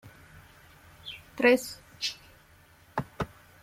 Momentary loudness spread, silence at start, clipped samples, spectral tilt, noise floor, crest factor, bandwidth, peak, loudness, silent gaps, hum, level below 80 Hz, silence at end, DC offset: 20 LU; 0.05 s; under 0.1%; -4 dB/octave; -58 dBFS; 24 dB; 16 kHz; -8 dBFS; -29 LUFS; none; none; -58 dBFS; 0.35 s; under 0.1%